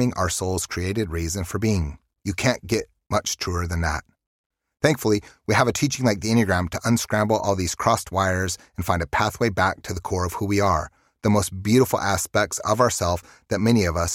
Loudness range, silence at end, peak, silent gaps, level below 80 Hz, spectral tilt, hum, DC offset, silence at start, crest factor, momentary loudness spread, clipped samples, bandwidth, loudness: 4 LU; 0 s; -4 dBFS; 4.27-4.50 s; -40 dBFS; -5 dB/octave; none; under 0.1%; 0 s; 20 dB; 7 LU; under 0.1%; 16.5 kHz; -23 LUFS